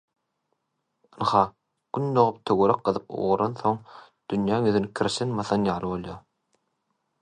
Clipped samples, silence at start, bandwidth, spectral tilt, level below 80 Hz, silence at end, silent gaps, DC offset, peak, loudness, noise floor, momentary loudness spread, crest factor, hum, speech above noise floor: under 0.1%; 1.15 s; 10 kHz; -6.5 dB/octave; -58 dBFS; 1.05 s; none; under 0.1%; -4 dBFS; -25 LUFS; -78 dBFS; 11 LU; 22 dB; none; 54 dB